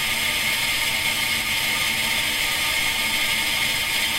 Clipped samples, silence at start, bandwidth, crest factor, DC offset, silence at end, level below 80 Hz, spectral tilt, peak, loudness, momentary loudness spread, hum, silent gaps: under 0.1%; 0 s; 16 kHz; 14 dB; under 0.1%; 0 s; -46 dBFS; 0 dB/octave; -10 dBFS; -20 LUFS; 1 LU; none; none